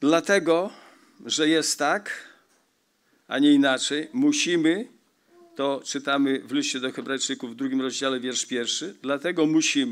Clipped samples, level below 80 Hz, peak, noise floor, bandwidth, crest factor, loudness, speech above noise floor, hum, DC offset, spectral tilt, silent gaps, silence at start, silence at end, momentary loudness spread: under 0.1%; -88 dBFS; -6 dBFS; -68 dBFS; 14 kHz; 18 dB; -24 LUFS; 45 dB; none; under 0.1%; -3 dB/octave; none; 0 s; 0 s; 9 LU